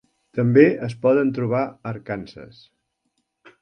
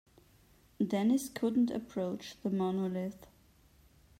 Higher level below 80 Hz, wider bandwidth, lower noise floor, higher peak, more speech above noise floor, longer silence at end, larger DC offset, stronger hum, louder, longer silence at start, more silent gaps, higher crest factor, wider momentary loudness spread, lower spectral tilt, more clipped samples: first, -60 dBFS vs -68 dBFS; second, 9.4 kHz vs 16 kHz; first, -74 dBFS vs -64 dBFS; first, 0 dBFS vs -20 dBFS; first, 54 dB vs 31 dB; about the same, 1.15 s vs 1.05 s; neither; neither; first, -20 LUFS vs -34 LUFS; second, 0.35 s vs 0.8 s; neither; first, 22 dB vs 14 dB; first, 16 LU vs 9 LU; first, -9 dB/octave vs -6.5 dB/octave; neither